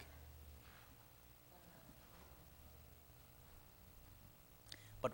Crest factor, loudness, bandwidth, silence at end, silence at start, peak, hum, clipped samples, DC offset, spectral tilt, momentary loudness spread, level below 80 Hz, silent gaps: 30 dB; -59 LUFS; 16.5 kHz; 0 s; 0 s; -26 dBFS; 60 Hz at -70 dBFS; under 0.1%; under 0.1%; -5 dB/octave; 5 LU; -68 dBFS; none